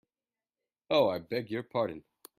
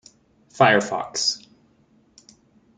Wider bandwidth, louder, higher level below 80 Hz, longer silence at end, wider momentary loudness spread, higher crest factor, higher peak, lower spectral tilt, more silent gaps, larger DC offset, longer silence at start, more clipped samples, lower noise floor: first, 15.5 kHz vs 9.6 kHz; second, -31 LUFS vs -20 LUFS; second, -72 dBFS vs -66 dBFS; second, 0.4 s vs 1.4 s; about the same, 8 LU vs 10 LU; about the same, 20 dB vs 22 dB; second, -14 dBFS vs -2 dBFS; first, -6 dB/octave vs -3 dB/octave; neither; neither; first, 0.9 s vs 0.55 s; neither; first, under -90 dBFS vs -59 dBFS